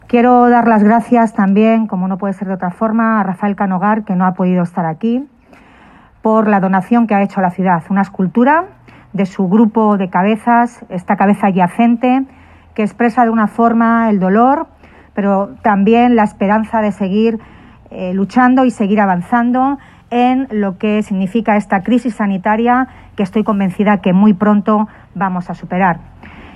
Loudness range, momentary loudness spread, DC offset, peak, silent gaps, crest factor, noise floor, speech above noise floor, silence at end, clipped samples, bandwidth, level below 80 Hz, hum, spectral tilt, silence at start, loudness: 3 LU; 9 LU; under 0.1%; 0 dBFS; none; 12 dB; -43 dBFS; 31 dB; 0.05 s; under 0.1%; 10 kHz; -48 dBFS; none; -8.5 dB/octave; 0.1 s; -13 LUFS